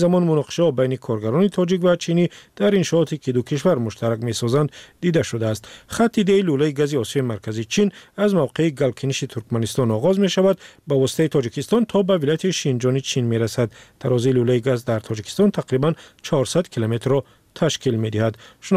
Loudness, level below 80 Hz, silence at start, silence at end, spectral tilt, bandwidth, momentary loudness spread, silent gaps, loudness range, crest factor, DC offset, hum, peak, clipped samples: -21 LUFS; -56 dBFS; 0 s; 0 s; -6 dB/octave; 15.5 kHz; 7 LU; none; 2 LU; 12 dB; under 0.1%; none; -8 dBFS; under 0.1%